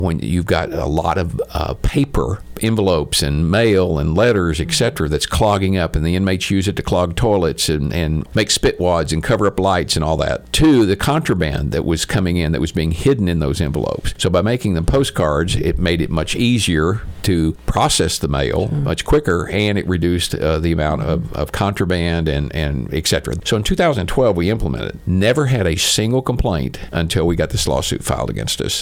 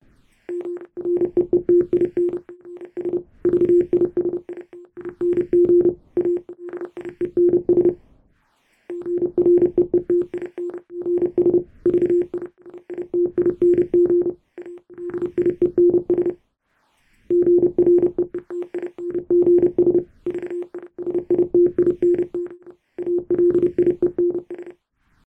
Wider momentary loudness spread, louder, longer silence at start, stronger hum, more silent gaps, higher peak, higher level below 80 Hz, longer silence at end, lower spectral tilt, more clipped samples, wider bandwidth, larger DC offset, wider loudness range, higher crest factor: second, 5 LU vs 17 LU; first, -17 LUFS vs -20 LUFS; second, 0 s vs 0.5 s; neither; neither; first, -2 dBFS vs -8 dBFS; first, -28 dBFS vs -54 dBFS; second, 0 s vs 0.55 s; second, -5 dB/octave vs -10.5 dB/octave; neither; first, 17.5 kHz vs 2.8 kHz; neither; about the same, 2 LU vs 3 LU; about the same, 14 dB vs 12 dB